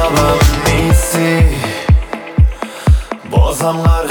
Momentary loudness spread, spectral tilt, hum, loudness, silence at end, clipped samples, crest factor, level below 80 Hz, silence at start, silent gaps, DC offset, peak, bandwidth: 5 LU; -5.5 dB/octave; none; -13 LUFS; 0 s; under 0.1%; 12 dB; -16 dBFS; 0 s; none; under 0.1%; 0 dBFS; 19.5 kHz